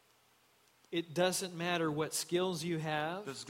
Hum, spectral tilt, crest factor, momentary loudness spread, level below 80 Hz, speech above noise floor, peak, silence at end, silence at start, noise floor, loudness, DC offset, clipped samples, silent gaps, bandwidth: none; -4 dB/octave; 20 dB; 6 LU; -76 dBFS; 34 dB; -16 dBFS; 0 s; 0.9 s; -69 dBFS; -35 LUFS; under 0.1%; under 0.1%; none; 16.5 kHz